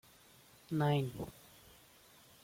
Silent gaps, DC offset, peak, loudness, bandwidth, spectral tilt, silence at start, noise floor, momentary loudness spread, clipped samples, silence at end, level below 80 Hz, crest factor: none; under 0.1%; -22 dBFS; -37 LUFS; 16.5 kHz; -7 dB/octave; 0.7 s; -63 dBFS; 27 LU; under 0.1%; 1.15 s; -68 dBFS; 18 dB